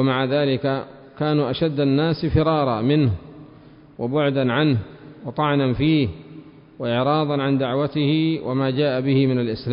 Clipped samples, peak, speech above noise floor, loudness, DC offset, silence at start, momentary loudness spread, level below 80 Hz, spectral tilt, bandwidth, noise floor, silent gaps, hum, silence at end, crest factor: under 0.1%; -6 dBFS; 26 dB; -21 LUFS; under 0.1%; 0 s; 9 LU; -44 dBFS; -12 dB/octave; 5.4 kHz; -46 dBFS; none; none; 0 s; 14 dB